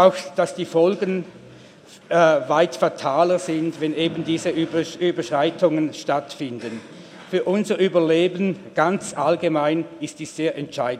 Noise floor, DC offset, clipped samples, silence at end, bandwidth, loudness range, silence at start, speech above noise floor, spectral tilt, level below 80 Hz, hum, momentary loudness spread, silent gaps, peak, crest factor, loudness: -45 dBFS; under 0.1%; under 0.1%; 0 s; 13 kHz; 3 LU; 0 s; 24 dB; -5.5 dB/octave; -70 dBFS; none; 12 LU; none; 0 dBFS; 20 dB; -21 LUFS